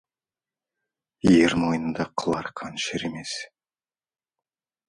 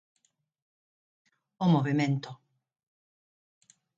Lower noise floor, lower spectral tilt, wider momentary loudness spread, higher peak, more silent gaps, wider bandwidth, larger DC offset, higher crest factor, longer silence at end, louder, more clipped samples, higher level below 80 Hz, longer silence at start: about the same, under -90 dBFS vs under -90 dBFS; second, -5 dB/octave vs -7.5 dB/octave; first, 15 LU vs 10 LU; first, -6 dBFS vs -14 dBFS; neither; first, 11.5 kHz vs 7.8 kHz; neither; about the same, 20 dB vs 20 dB; second, 1.45 s vs 1.65 s; first, -24 LUFS vs -28 LUFS; neither; first, -52 dBFS vs -76 dBFS; second, 1.25 s vs 1.6 s